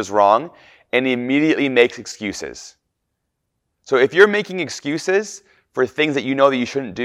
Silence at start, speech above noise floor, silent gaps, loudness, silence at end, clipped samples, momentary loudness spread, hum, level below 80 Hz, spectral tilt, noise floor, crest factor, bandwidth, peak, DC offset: 0 s; 57 dB; none; -18 LUFS; 0 s; under 0.1%; 16 LU; none; -62 dBFS; -4.5 dB/octave; -75 dBFS; 20 dB; 12 kHz; 0 dBFS; under 0.1%